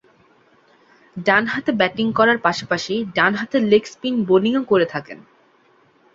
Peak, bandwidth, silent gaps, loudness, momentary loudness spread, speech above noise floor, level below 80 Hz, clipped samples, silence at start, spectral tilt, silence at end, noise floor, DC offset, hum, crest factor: -2 dBFS; 7.8 kHz; none; -18 LUFS; 8 LU; 38 dB; -60 dBFS; under 0.1%; 1.15 s; -5.5 dB/octave; 0.95 s; -56 dBFS; under 0.1%; none; 18 dB